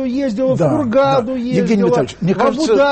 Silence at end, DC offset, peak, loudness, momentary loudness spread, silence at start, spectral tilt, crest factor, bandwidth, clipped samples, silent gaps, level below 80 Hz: 0 s; under 0.1%; -2 dBFS; -15 LUFS; 4 LU; 0 s; -7 dB/octave; 12 dB; 8.8 kHz; under 0.1%; none; -46 dBFS